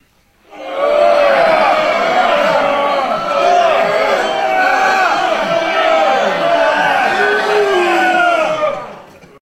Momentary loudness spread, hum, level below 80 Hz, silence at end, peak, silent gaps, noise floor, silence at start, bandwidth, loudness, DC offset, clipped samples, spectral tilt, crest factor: 5 LU; none; -50 dBFS; 0.4 s; 0 dBFS; none; -52 dBFS; 0.5 s; 15 kHz; -12 LUFS; under 0.1%; under 0.1%; -3.5 dB/octave; 14 dB